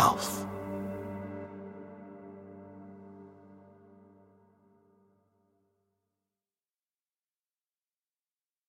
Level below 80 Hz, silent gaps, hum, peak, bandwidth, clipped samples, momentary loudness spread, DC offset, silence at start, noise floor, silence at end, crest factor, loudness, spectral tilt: -70 dBFS; none; none; -10 dBFS; 16.5 kHz; under 0.1%; 22 LU; under 0.1%; 0 s; under -90 dBFS; 4.5 s; 30 dB; -38 LUFS; -4 dB/octave